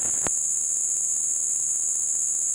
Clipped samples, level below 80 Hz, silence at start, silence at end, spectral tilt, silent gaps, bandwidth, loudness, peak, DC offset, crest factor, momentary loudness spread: under 0.1%; -60 dBFS; 0 s; 0 s; 0 dB/octave; none; 17 kHz; -22 LUFS; -6 dBFS; under 0.1%; 18 dB; 0 LU